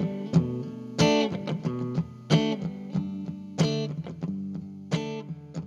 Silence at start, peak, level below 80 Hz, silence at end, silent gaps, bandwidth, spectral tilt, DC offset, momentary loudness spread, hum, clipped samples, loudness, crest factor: 0 s; -8 dBFS; -56 dBFS; 0 s; none; 11 kHz; -6 dB/octave; under 0.1%; 12 LU; none; under 0.1%; -29 LUFS; 20 dB